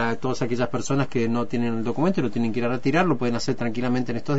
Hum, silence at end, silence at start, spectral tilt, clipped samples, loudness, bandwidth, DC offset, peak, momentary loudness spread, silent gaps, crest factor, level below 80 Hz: none; 0 s; 0 s; -6.5 dB/octave; under 0.1%; -24 LUFS; 8 kHz; 4%; -6 dBFS; 4 LU; none; 16 dB; -52 dBFS